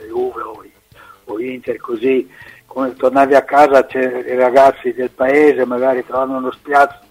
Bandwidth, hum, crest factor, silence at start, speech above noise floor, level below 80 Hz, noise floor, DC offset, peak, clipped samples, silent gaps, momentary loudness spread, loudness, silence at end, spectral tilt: 15.5 kHz; none; 14 dB; 0 s; 30 dB; -54 dBFS; -44 dBFS; under 0.1%; 0 dBFS; under 0.1%; none; 14 LU; -14 LUFS; 0.15 s; -5.5 dB/octave